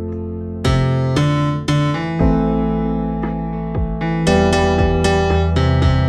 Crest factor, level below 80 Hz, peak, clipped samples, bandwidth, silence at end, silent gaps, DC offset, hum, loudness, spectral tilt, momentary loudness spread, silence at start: 14 dB; -26 dBFS; -2 dBFS; under 0.1%; 11.5 kHz; 0 s; none; under 0.1%; none; -17 LUFS; -7 dB/octave; 8 LU; 0 s